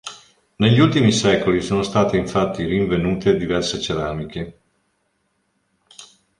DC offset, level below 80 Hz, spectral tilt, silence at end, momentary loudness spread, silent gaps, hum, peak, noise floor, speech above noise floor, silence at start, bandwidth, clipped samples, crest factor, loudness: under 0.1%; -44 dBFS; -5.5 dB/octave; 0.35 s; 13 LU; none; none; -2 dBFS; -68 dBFS; 50 dB; 0.05 s; 11.5 kHz; under 0.1%; 18 dB; -19 LUFS